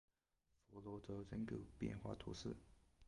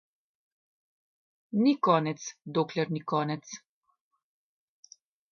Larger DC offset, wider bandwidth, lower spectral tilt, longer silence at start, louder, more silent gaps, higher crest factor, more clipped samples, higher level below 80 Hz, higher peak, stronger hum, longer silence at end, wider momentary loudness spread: neither; first, 11 kHz vs 7 kHz; about the same, -6.5 dB/octave vs -6 dB/octave; second, 0.7 s vs 1.55 s; second, -51 LUFS vs -29 LUFS; neither; about the same, 20 dB vs 22 dB; neither; first, -66 dBFS vs -78 dBFS; second, -32 dBFS vs -10 dBFS; neither; second, 0 s vs 1.75 s; second, 10 LU vs 14 LU